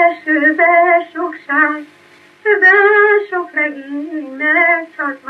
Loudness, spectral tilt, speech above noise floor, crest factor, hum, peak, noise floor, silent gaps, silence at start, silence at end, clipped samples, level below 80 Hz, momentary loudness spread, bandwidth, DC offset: -12 LUFS; -4.5 dB/octave; 23 dB; 14 dB; none; 0 dBFS; -39 dBFS; none; 0 s; 0 s; under 0.1%; -80 dBFS; 15 LU; 6 kHz; under 0.1%